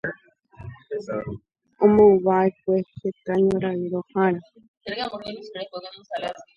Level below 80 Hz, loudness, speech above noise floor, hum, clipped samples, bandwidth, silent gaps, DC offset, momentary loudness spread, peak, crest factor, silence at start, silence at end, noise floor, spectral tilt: -56 dBFS; -22 LUFS; 26 dB; none; under 0.1%; 7 kHz; 4.68-4.81 s; under 0.1%; 21 LU; -4 dBFS; 18 dB; 0.05 s; 0.15 s; -48 dBFS; -8 dB/octave